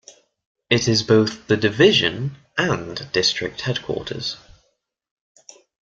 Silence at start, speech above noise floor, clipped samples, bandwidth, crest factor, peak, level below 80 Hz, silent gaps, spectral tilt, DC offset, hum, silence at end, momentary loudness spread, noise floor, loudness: 0.7 s; 49 dB; under 0.1%; 7.8 kHz; 20 dB; -2 dBFS; -54 dBFS; none; -4.5 dB/octave; under 0.1%; none; 1.55 s; 13 LU; -69 dBFS; -20 LUFS